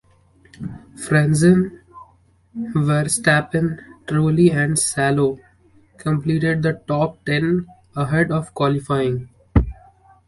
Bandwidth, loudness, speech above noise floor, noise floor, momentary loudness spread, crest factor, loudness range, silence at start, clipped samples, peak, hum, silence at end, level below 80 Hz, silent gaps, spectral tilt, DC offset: 11.5 kHz; -19 LUFS; 37 dB; -55 dBFS; 16 LU; 18 dB; 3 LU; 0.6 s; under 0.1%; -2 dBFS; none; 0.55 s; -36 dBFS; none; -5.5 dB/octave; under 0.1%